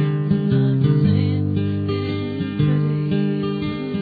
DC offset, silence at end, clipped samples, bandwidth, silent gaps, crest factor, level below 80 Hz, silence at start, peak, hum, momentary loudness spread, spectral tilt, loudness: under 0.1%; 0 s; under 0.1%; 4.9 kHz; none; 14 dB; -48 dBFS; 0 s; -6 dBFS; none; 7 LU; -11 dB/octave; -20 LUFS